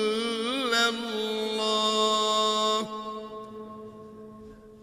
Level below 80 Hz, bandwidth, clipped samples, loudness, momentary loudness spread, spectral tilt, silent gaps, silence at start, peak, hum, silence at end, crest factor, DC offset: -64 dBFS; 15.5 kHz; under 0.1%; -26 LUFS; 21 LU; -2 dB/octave; none; 0 s; -12 dBFS; none; 0 s; 16 dB; under 0.1%